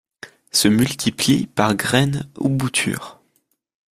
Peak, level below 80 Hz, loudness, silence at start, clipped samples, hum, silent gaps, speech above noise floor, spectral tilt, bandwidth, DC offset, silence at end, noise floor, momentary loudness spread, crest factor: -2 dBFS; -52 dBFS; -19 LUFS; 0.25 s; under 0.1%; none; none; 48 dB; -4 dB/octave; 16 kHz; under 0.1%; 0.8 s; -67 dBFS; 7 LU; 20 dB